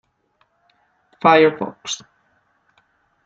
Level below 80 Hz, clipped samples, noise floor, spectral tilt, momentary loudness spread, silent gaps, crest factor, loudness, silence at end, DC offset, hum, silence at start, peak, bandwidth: -68 dBFS; under 0.1%; -65 dBFS; -4 dB/octave; 16 LU; none; 20 dB; -17 LUFS; 1.3 s; under 0.1%; none; 1.25 s; -2 dBFS; 7.8 kHz